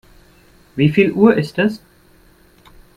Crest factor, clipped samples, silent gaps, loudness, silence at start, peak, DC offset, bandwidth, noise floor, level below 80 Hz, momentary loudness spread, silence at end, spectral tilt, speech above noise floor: 18 dB; under 0.1%; none; -15 LUFS; 0.75 s; 0 dBFS; under 0.1%; 14 kHz; -50 dBFS; -50 dBFS; 16 LU; 1.2 s; -8 dB/octave; 36 dB